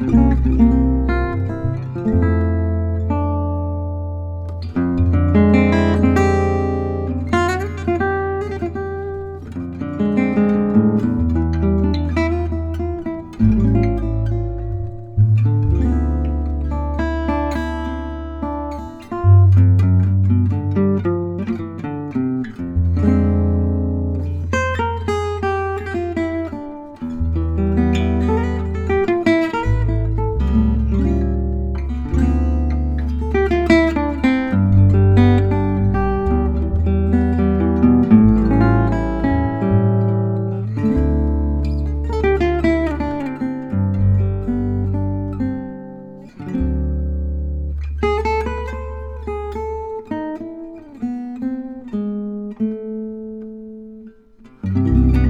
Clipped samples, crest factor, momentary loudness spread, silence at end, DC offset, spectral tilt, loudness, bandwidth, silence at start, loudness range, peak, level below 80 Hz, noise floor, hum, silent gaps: under 0.1%; 18 dB; 13 LU; 0 s; 0.2%; -9 dB/octave; -18 LUFS; 8 kHz; 0 s; 8 LU; 0 dBFS; -24 dBFS; -46 dBFS; none; none